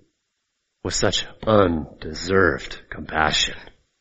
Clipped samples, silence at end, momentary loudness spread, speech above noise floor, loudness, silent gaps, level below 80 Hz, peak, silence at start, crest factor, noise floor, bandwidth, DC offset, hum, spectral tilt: under 0.1%; 0.3 s; 15 LU; 54 dB; -21 LUFS; none; -40 dBFS; -2 dBFS; 0.85 s; 20 dB; -76 dBFS; 8 kHz; under 0.1%; none; -3 dB/octave